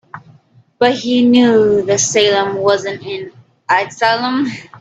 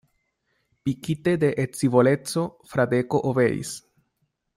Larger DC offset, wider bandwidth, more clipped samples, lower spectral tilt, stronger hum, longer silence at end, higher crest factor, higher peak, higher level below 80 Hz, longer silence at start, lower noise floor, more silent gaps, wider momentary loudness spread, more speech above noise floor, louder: neither; second, 8.4 kHz vs 16 kHz; neither; second, -3.5 dB/octave vs -6.5 dB/octave; neither; second, 0.05 s vs 0.8 s; about the same, 14 dB vs 18 dB; first, 0 dBFS vs -6 dBFS; about the same, -56 dBFS vs -60 dBFS; second, 0.15 s vs 0.85 s; second, -49 dBFS vs -74 dBFS; neither; first, 15 LU vs 11 LU; second, 35 dB vs 52 dB; first, -14 LUFS vs -23 LUFS